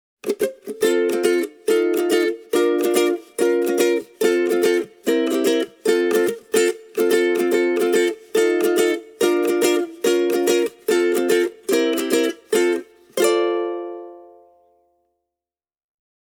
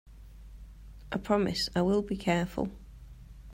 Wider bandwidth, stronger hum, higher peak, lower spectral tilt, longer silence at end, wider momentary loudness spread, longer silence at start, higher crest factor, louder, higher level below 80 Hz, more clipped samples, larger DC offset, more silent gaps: first, over 20 kHz vs 16 kHz; neither; first, -4 dBFS vs -14 dBFS; second, -3 dB/octave vs -6 dB/octave; first, 2.15 s vs 0 s; second, 4 LU vs 24 LU; first, 0.25 s vs 0.05 s; about the same, 16 dB vs 18 dB; first, -20 LUFS vs -30 LUFS; second, -70 dBFS vs -48 dBFS; neither; neither; neither